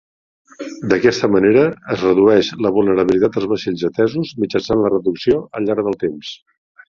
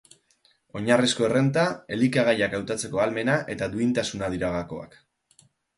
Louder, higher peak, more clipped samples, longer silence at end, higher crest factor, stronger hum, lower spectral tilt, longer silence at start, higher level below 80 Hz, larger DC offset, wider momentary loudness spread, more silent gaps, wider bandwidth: first, -16 LUFS vs -24 LUFS; first, -2 dBFS vs -6 dBFS; neither; second, 0.6 s vs 0.9 s; about the same, 16 dB vs 20 dB; neither; first, -6.5 dB/octave vs -5 dB/octave; second, 0.6 s vs 0.75 s; first, -48 dBFS vs -54 dBFS; neither; about the same, 10 LU vs 10 LU; neither; second, 7.2 kHz vs 11.5 kHz